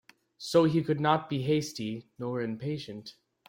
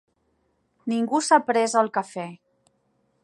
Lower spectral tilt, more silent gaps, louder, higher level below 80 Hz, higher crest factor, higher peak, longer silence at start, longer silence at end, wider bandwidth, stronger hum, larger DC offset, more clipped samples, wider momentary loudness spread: first, -6 dB/octave vs -3.5 dB/octave; neither; second, -29 LUFS vs -22 LUFS; first, -68 dBFS vs -80 dBFS; about the same, 20 dB vs 22 dB; second, -10 dBFS vs -4 dBFS; second, 0.4 s vs 0.85 s; second, 0.35 s vs 0.9 s; first, 16.5 kHz vs 11.5 kHz; neither; neither; neither; about the same, 17 LU vs 16 LU